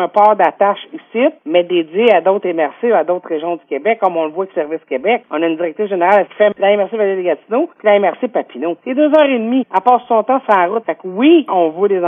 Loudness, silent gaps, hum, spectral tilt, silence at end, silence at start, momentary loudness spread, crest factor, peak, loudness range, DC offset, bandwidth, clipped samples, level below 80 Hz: -14 LUFS; none; none; -7.5 dB/octave; 0 s; 0 s; 9 LU; 14 dB; 0 dBFS; 3 LU; under 0.1%; 3.8 kHz; under 0.1%; -74 dBFS